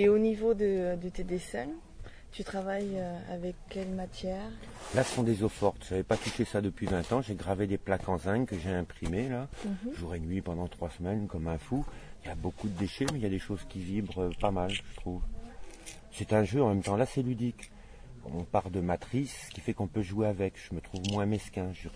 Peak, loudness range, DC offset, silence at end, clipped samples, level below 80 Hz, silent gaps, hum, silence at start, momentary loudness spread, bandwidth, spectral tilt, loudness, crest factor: -12 dBFS; 5 LU; under 0.1%; 0 s; under 0.1%; -46 dBFS; none; none; 0 s; 13 LU; 11 kHz; -6.5 dB/octave; -33 LUFS; 20 dB